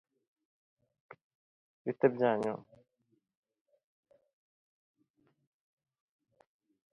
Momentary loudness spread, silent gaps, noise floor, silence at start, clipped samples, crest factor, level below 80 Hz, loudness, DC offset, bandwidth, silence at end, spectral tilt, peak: 14 LU; none; -75 dBFS; 1.85 s; under 0.1%; 28 dB; -84 dBFS; -32 LUFS; under 0.1%; 6 kHz; 4.3 s; -6 dB/octave; -12 dBFS